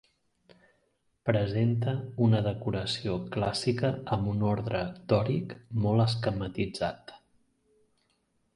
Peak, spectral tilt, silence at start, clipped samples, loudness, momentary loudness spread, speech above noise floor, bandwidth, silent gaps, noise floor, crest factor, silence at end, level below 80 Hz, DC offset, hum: -10 dBFS; -7 dB/octave; 1.25 s; under 0.1%; -30 LUFS; 8 LU; 45 dB; 11.5 kHz; none; -73 dBFS; 20 dB; 1.4 s; -54 dBFS; under 0.1%; none